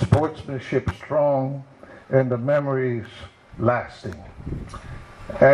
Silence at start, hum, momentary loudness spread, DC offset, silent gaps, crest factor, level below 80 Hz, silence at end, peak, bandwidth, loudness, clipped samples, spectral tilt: 0 s; none; 19 LU; under 0.1%; none; 20 dB; -44 dBFS; 0 s; -2 dBFS; 11 kHz; -24 LUFS; under 0.1%; -8 dB/octave